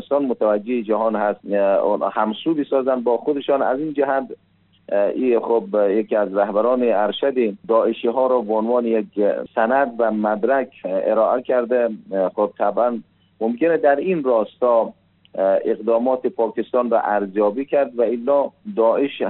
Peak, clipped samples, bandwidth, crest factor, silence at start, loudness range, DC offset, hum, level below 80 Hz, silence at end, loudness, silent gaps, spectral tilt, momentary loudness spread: -4 dBFS; under 0.1%; 4.2 kHz; 14 dB; 0 s; 2 LU; under 0.1%; none; -70 dBFS; 0 s; -20 LUFS; none; -4.5 dB/octave; 4 LU